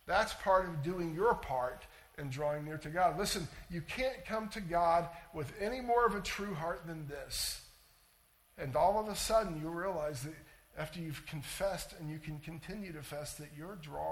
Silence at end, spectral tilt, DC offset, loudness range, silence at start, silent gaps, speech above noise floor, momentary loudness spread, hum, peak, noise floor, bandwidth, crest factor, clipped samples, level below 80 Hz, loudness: 0 s; -4.5 dB/octave; under 0.1%; 7 LU; 0.05 s; none; 32 dB; 14 LU; none; -16 dBFS; -68 dBFS; 18 kHz; 20 dB; under 0.1%; -56 dBFS; -36 LUFS